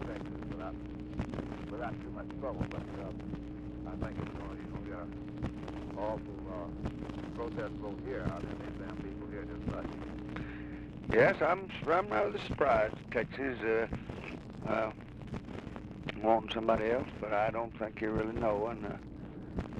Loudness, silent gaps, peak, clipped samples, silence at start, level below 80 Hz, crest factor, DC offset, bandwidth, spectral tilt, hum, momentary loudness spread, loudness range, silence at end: -36 LUFS; none; -14 dBFS; under 0.1%; 0 s; -50 dBFS; 22 dB; under 0.1%; 10 kHz; -7.5 dB/octave; none; 13 LU; 9 LU; 0 s